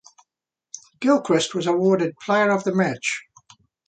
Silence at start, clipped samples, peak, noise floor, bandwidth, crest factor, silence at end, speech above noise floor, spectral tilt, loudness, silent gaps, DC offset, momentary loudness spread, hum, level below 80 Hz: 0.75 s; under 0.1%; -6 dBFS; -83 dBFS; 9.4 kHz; 16 dB; 0.65 s; 63 dB; -5 dB/octave; -21 LUFS; none; under 0.1%; 15 LU; none; -70 dBFS